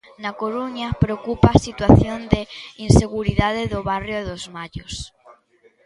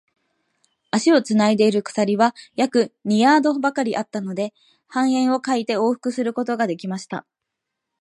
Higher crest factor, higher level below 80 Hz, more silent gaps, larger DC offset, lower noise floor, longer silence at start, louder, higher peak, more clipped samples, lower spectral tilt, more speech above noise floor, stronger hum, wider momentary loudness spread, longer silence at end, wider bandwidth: about the same, 20 dB vs 18 dB; first, -32 dBFS vs -74 dBFS; neither; neither; second, -57 dBFS vs -81 dBFS; second, 0.2 s vs 0.95 s; about the same, -19 LUFS vs -20 LUFS; about the same, 0 dBFS vs -2 dBFS; neither; first, -6.5 dB/octave vs -5 dB/octave; second, 38 dB vs 62 dB; neither; first, 17 LU vs 12 LU; about the same, 0.8 s vs 0.8 s; about the same, 11.5 kHz vs 11.5 kHz